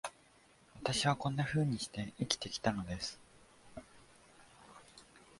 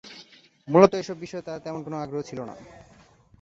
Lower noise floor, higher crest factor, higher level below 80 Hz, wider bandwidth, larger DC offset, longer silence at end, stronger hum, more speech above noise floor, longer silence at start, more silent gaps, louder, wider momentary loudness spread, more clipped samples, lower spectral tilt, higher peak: first, -65 dBFS vs -52 dBFS; about the same, 26 dB vs 24 dB; about the same, -62 dBFS vs -62 dBFS; first, 11.5 kHz vs 7.8 kHz; neither; second, 0.2 s vs 0.75 s; neither; about the same, 29 dB vs 27 dB; about the same, 0.05 s vs 0.05 s; neither; second, -37 LUFS vs -25 LUFS; about the same, 23 LU vs 25 LU; neither; second, -4.5 dB/octave vs -6.5 dB/octave; second, -12 dBFS vs -2 dBFS